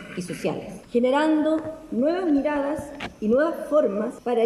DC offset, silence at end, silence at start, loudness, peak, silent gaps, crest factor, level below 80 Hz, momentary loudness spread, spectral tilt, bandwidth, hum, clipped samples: under 0.1%; 0 s; 0 s; -24 LUFS; -10 dBFS; none; 14 dB; -56 dBFS; 10 LU; -6 dB/octave; 13 kHz; none; under 0.1%